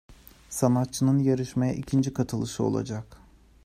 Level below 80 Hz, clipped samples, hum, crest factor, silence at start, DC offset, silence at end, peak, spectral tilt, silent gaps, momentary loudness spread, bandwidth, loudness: -54 dBFS; under 0.1%; none; 18 dB; 0.1 s; under 0.1%; 0.5 s; -8 dBFS; -6.5 dB/octave; none; 9 LU; 15.5 kHz; -26 LUFS